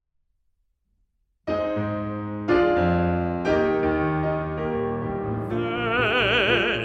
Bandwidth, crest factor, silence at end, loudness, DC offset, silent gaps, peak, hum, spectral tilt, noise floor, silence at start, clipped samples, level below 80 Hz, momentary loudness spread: 8 kHz; 16 dB; 0 s; -23 LUFS; under 0.1%; none; -8 dBFS; none; -7 dB/octave; -70 dBFS; 1.45 s; under 0.1%; -46 dBFS; 9 LU